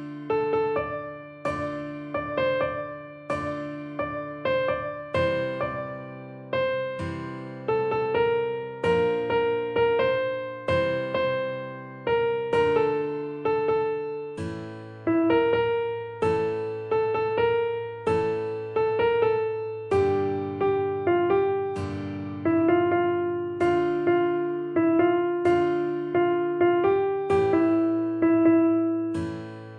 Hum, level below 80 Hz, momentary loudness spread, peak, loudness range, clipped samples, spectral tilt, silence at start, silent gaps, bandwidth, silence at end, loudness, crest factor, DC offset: none; -58 dBFS; 11 LU; -8 dBFS; 6 LU; under 0.1%; -7.5 dB/octave; 0 s; none; 9.6 kHz; 0 s; -25 LUFS; 16 dB; under 0.1%